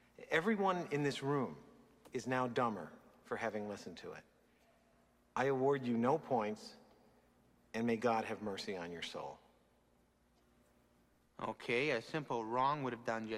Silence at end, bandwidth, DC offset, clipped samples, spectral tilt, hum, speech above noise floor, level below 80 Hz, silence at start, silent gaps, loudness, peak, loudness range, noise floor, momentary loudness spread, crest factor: 0 s; 14 kHz; under 0.1%; under 0.1%; -5.5 dB/octave; 60 Hz at -70 dBFS; 35 dB; -76 dBFS; 0.2 s; none; -38 LUFS; -20 dBFS; 5 LU; -73 dBFS; 13 LU; 20 dB